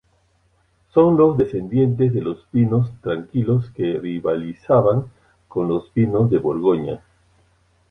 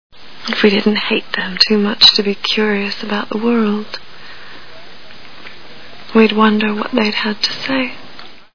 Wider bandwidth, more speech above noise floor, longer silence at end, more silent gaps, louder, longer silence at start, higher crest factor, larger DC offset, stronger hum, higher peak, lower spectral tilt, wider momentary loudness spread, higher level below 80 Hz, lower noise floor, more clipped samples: second, 3.8 kHz vs 5.4 kHz; first, 43 dB vs 24 dB; first, 0.95 s vs 0 s; neither; second, -19 LUFS vs -14 LUFS; first, 0.95 s vs 0.1 s; about the same, 18 dB vs 16 dB; second, under 0.1% vs 3%; neither; about the same, -2 dBFS vs 0 dBFS; first, -11 dB/octave vs -4.5 dB/octave; second, 9 LU vs 25 LU; about the same, -50 dBFS vs -54 dBFS; first, -62 dBFS vs -39 dBFS; second, under 0.1% vs 0.2%